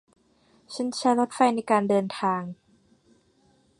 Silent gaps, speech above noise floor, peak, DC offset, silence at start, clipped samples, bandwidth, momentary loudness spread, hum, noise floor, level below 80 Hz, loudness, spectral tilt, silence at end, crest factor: none; 39 dB; -8 dBFS; under 0.1%; 0.7 s; under 0.1%; 11.5 kHz; 10 LU; none; -63 dBFS; -72 dBFS; -25 LUFS; -5 dB/octave; 1.25 s; 20 dB